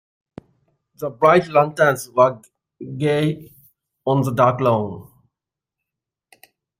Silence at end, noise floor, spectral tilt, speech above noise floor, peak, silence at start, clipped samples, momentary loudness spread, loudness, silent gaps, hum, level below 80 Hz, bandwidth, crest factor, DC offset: 1.75 s; -86 dBFS; -6.5 dB/octave; 68 dB; -2 dBFS; 1 s; under 0.1%; 19 LU; -18 LUFS; none; none; -60 dBFS; 16 kHz; 20 dB; under 0.1%